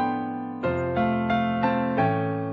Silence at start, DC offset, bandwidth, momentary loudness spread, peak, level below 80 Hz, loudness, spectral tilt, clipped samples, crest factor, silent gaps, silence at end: 0 s; under 0.1%; 5.8 kHz; 6 LU; -10 dBFS; -56 dBFS; -25 LUFS; -9 dB/octave; under 0.1%; 16 dB; none; 0 s